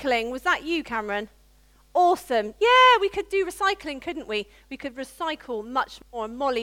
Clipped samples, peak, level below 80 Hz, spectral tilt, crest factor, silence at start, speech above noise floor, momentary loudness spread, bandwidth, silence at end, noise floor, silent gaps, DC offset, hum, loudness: under 0.1%; -8 dBFS; -54 dBFS; -2.5 dB/octave; 16 dB; 0 s; 33 dB; 17 LU; 16.5 kHz; 0 s; -57 dBFS; none; under 0.1%; none; -24 LUFS